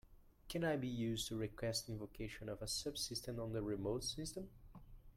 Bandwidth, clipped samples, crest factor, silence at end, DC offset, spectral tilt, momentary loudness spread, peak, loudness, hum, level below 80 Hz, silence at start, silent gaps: 16.5 kHz; under 0.1%; 16 dB; 0.05 s; under 0.1%; -4.5 dB/octave; 10 LU; -28 dBFS; -43 LUFS; none; -60 dBFS; 0.1 s; none